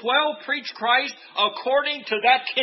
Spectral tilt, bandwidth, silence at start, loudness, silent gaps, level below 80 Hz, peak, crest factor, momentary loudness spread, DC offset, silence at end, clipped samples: -2.5 dB/octave; 6 kHz; 0 s; -22 LUFS; none; -76 dBFS; -6 dBFS; 18 dB; 7 LU; under 0.1%; 0 s; under 0.1%